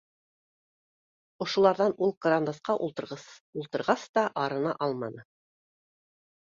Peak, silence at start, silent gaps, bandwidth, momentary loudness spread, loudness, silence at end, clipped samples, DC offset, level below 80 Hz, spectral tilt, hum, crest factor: -8 dBFS; 1.4 s; 2.17-2.21 s, 3.40-3.53 s, 4.09-4.14 s; 7.6 kHz; 15 LU; -28 LUFS; 1.35 s; under 0.1%; under 0.1%; -74 dBFS; -5.5 dB/octave; none; 22 dB